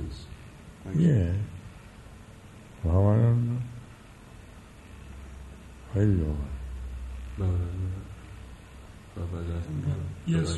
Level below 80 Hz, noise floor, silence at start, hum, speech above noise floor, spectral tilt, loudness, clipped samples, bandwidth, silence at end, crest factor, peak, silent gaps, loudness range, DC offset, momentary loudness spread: -42 dBFS; -48 dBFS; 0 s; none; 24 dB; -8 dB/octave; -29 LUFS; under 0.1%; 11.5 kHz; 0 s; 20 dB; -10 dBFS; none; 7 LU; under 0.1%; 25 LU